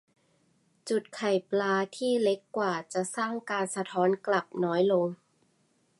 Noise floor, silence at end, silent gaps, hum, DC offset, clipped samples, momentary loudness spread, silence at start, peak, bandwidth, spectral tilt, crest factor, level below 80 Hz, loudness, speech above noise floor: -70 dBFS; 0.85 s; none; none; under 0.1%; under 0.1%; 6 LU; 0.85 s; -14 dBFS; 11.5 kHz; -5 dB/octave; 16 dB; -82 dBFS; -29 LUFS; 41 dB